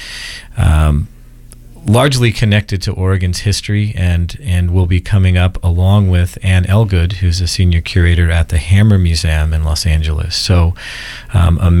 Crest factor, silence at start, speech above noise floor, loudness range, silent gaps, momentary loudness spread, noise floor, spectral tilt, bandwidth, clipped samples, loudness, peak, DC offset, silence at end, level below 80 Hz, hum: 12 dB; 0 s; 24 dB; 2 LU; none; 7 LU; -36 dBFS; -6 dB/octave; 12.5 kHz; under 0.1%; -13 LUFS; 0 dBFS; under 0.1%; 0 s; -20 dBFS; none